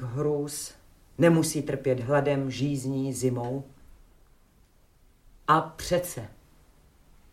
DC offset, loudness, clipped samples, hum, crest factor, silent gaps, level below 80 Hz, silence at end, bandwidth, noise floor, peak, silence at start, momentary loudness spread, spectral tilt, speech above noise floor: under 0.1%; -27 LUFS; under 0.1%; none; 22 dB; none; -54 dBFS; 1 s; 16.5 kHz; -60 dBFS; -8 dBFS; 0 s; 15 LU; -5.5 dB/octave; 34 dB